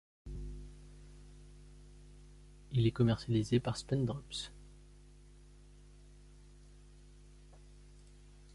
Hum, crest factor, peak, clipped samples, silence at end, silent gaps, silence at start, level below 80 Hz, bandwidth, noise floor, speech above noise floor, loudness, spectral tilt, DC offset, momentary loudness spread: 50 Hz at -55 dBFS; 22 dB; -18 dBFS; under 0.1%; 0 s; none; 0.25 s; -54 dBFS; 11.5 kHz; -58 dBFS; 25 dB; -35 LUFS; -6.5 dB/octave; under 0.1%; 28 LU